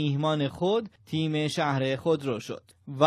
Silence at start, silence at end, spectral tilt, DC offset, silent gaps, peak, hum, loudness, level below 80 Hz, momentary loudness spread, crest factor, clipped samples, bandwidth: 0 s; 0 s; -6.5 dB/octave; under 0.1%; none; -6 dBFS; none; -28 LUFS; -68 dBFS; 10 LU; 20 dB; under 0.1%; 13.5 kHz